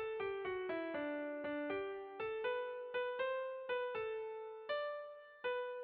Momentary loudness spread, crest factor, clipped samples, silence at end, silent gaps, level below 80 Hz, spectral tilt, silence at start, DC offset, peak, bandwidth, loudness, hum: 5 LU; 12 dB; under 0.1%; 0 s; none; -78 dBFS; -1.5 dB/octave; 0 s; under 0.1%; -30 dBFS; 4.8 kHz; -42 LUFS; none